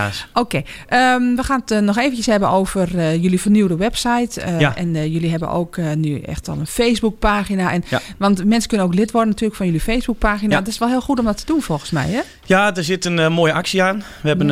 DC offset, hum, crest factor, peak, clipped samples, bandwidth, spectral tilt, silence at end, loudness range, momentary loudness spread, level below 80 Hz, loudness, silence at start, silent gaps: under 0.1%; none; 16 dB; 0 dBFS; under 0.1%; 15.5 kHz; -5.5 dB/octave; 0 s; 3 LU; 6 LU; -34 dBFS; -18 LUFS; 0 s; none